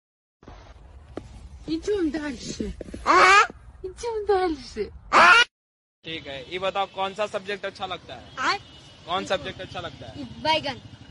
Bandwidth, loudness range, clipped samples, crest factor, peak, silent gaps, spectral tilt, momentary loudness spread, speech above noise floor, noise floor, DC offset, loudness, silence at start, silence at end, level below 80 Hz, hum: 11.5 kHz; 10 LU; under 0.1%; 20 dB; -4 dBFS; 5.51-6.02 s; -3 dB/octave; 24 LU; 21 dB; -46 dBFS; under 0.1%; -22 LUFS; 0.45 s; 0.15 s; -48 dBFS; none